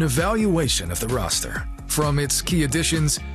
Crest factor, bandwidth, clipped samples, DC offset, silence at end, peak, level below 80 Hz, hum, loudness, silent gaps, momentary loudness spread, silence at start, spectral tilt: 16 dB; 13.5 kHz; under 0.1%; under 0.1%; 0 s; -6 dBFS; -32 dBFS; none; -22 LUFS; none; 5 LU; 0 s; -4 dB/octave